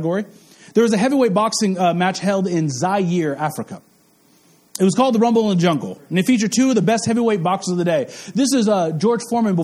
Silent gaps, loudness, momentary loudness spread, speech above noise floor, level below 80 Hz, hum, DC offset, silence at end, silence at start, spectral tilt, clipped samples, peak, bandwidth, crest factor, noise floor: none; -18 LUFS; 8 LU; 37 dB; -62 dBFS; none; under 0.1%; 0 s; 0 s; -5.5 dB/octave; under 0.1%; -2 dBFS; 15 kHz; 16 dB; -55 dBFS